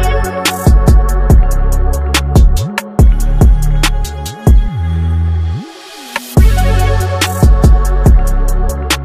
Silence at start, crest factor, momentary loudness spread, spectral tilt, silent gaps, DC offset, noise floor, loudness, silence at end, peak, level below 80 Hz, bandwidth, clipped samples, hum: 0 s; 10 dB; 7 LU; -5.5 dB/octave; none; under 0.1%; -30 dBFS; -12 LUFS; 0 s; 0 dBFS; -10 dBFS; 15.5 kHz; under 0.1%; none